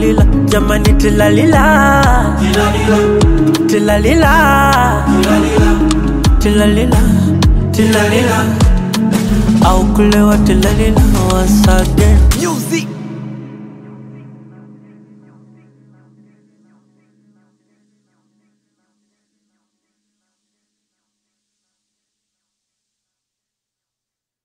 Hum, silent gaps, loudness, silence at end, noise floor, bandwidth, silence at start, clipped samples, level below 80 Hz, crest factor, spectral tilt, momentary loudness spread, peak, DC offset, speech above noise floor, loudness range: none; none; -11 LUFS; 10.2 s; -85 dBFS; 16.5 kHz; 0 s; under 0.1%; -18 dBFS; 12 dB; -6 dB/octave; 5 LU; 0 dBFS; under 0.1%; 76 dB; 6 LU